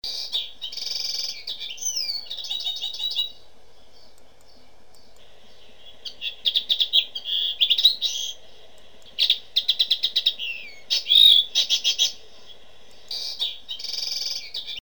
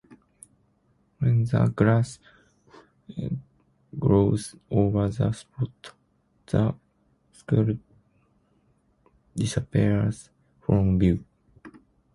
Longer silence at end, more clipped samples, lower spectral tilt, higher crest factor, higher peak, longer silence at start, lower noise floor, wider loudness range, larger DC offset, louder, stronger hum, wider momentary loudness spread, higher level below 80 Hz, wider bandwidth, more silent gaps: second, 0.1 s vs 0.45 s; neither; second, 3 dB/octave vs -8 dB/octave; about the same, 20 dB vs 20 dB; about the same, -6 dBFS vs -6 dBFS; second, 0 s vs 1.2 s; second, -55 dBFS vs -67 dBFS; first, 13 LU vs 4 LU; first, 1% vs under 0.1%; first, -21 LUFS vs -25 LUFS; neither; second, 15 LU vs 18 LU; second, -62 dBFS vs -46 dBFS; first, over 20 kHz vs 11.5 kHz; neither